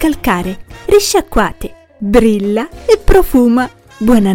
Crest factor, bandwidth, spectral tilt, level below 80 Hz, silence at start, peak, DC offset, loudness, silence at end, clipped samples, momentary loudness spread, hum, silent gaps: 12 dB; 17.5 kHz; -5 dB/octave; -22 dBFS; 0 s; 0 dBFS; under 0.1%; -12 LUFS; 0 s; under 0.1%; 14 LU; none; none